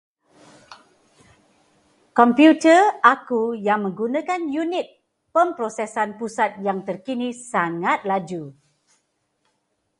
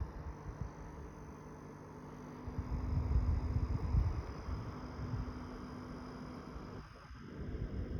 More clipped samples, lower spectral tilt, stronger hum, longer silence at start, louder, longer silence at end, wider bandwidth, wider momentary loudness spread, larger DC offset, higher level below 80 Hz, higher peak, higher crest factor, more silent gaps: neither; second, -5 dB/octave vs -8 dB/octave; neither; first, 0.7 s vs 0 s; first, -20 LUFS vs -42 LUFS; first, 1.5 s vs 0 s; first, 11 kHz vs 7 kHz; about the same, 14 LU vs 15 LU; neither; second, -72 dBFS vs -42 dBFS; first, 0 dBFS vs -22 dBFS; about the same, 22 dB vs 18 dB; neither